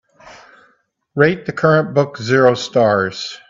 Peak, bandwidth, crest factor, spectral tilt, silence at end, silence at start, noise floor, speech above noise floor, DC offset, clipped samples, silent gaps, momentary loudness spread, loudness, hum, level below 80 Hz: 0 dBFS; 7.6 kHz; 16 dB; -6 dB/octave; 0.1 s; 0.25 s; -59 dBFS; 44 dB; under 0.1%; under 0.1%; none; 5 LU; -15 LUFS; none; -58 dBFS